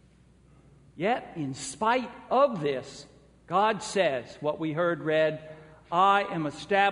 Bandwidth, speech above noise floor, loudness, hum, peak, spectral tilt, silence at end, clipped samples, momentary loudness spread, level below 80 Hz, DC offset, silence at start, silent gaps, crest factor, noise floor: 10.5 kHz; 31 dB; -27 LUFS; none; -10 dBFS; -4.5 dB/octave; 0 s; under 0.1%; 11 LU; -64 dBFS; under 0.1%; 0.95 s; none; 18 dB; -58 dBFS